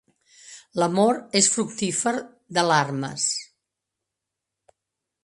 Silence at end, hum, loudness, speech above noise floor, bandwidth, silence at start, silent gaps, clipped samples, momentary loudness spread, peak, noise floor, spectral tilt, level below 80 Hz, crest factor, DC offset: 1.8 s; none; -23 LUFS; 62 dB; 11.5 kHz; 0.45 s; none; under 0.1%; 12 LU; -4 dBFS; -85 dBFS; -3 dB/octave; -70 dBFS; 22 dB; under 0.1%